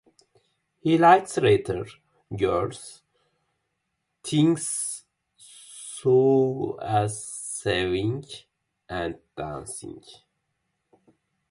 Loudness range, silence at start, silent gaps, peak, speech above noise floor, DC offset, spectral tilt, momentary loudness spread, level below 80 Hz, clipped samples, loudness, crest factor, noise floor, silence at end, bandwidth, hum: 8 LU; 0.85 s; none; -2 dBFS; 55 dB; under 0.1%; -5 dB/octave; 21 LU; -54 dBFS; under 0.1%; -24 LUFS; 24 dB; -79 dBFS; 1.4 s; 11.5 kHz; none